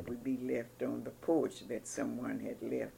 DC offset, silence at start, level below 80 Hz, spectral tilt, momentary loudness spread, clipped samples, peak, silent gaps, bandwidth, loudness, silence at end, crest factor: under 0.1%; 0 s; -68 dBFS; -5.5 dB/octave; 7 LU; under 0.1%; -20 dBFS; none; 17 kHz; -38 LUFS; 0 s; 18 dB